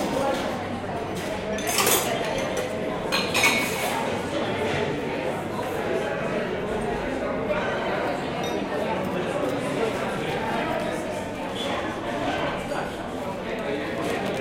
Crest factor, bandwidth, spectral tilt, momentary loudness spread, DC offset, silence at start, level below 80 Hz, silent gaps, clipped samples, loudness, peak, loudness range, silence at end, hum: 20 dB; 16.5 kHz; -3.5 dB/octave; 8 LU; under 0.1%; 0 s; -50 dBFS; none; under 0.1%; -26 LUFS; -6 dBFS; 5 LU; 0 s; none